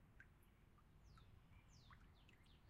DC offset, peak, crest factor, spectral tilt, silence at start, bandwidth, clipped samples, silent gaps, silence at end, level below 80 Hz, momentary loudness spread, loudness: under 0.1%; -50 dBFS; 18 dB; -5 dB/octave; 0 s; 11 kHz; under 0.1%; none; 0 s; -72 dBFS; 2 LU; -69 LUFS